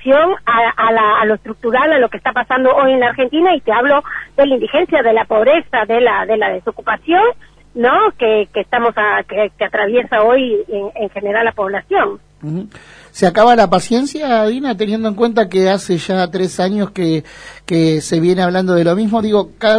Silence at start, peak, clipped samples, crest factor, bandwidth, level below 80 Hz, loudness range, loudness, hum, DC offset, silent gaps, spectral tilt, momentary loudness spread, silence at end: 0 s; 0 dBFS; under 0.1%; 14 dB; 11 kHz; -48 dBFS; 3 LU; -14 LUFS; none; under 0.1%; none; -5.5 dB/octave; 8 LU; 0 s